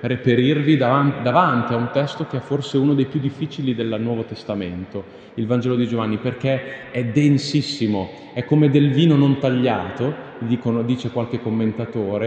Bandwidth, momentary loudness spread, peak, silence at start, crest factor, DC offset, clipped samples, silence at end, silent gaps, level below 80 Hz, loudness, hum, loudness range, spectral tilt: 8.6 kHz; 11 LU; 0 dBFS; 0 s; 20 dB; under 0.1%; under 0.1%; 0 s; none; -58 dBFS; -20 LUFS; none; 5 LU; -7.5 dB/octave